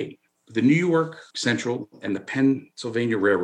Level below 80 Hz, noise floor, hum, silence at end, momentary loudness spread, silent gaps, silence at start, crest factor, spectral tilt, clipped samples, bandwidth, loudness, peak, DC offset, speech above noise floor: -76 dBFS; -44 dBFS; none; 0 s; 11 LU; none; 0 s; 16 dB; -5.5 dB/octave; under 0.1%; 10 kHz; -24 LUFS; -8 dBFS; under 0.1%; 21 dB